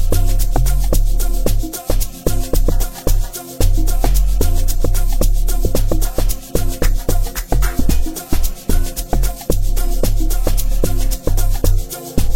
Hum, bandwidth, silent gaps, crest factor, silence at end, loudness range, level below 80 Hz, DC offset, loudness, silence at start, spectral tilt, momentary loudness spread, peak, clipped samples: none; 16.5 kHz; none; 12 dB; 0 s; 1 LU; -16 dBFS; 10%; -20 LUFS; 0 s; -5 dB/octave; 4 LU; 0 dBFS; under 0.1%